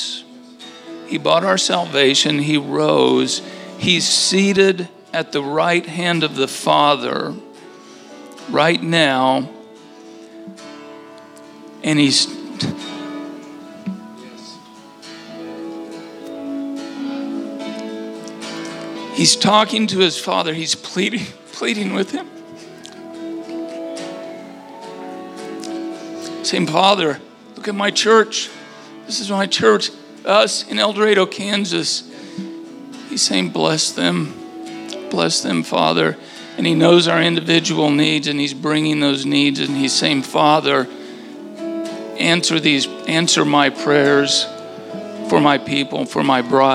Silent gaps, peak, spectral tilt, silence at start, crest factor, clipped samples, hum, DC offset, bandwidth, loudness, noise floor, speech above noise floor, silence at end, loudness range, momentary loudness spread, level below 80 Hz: none; 0 dBFS; -3.5 dB/octave; 0 s; 18 dB; under 0.1%; none; under 0.1%; 14.5 kHz; -17 LUFS; -41 dBFS; 25 dB; 0 s; 13 LU; 21 LU; -70 dBFS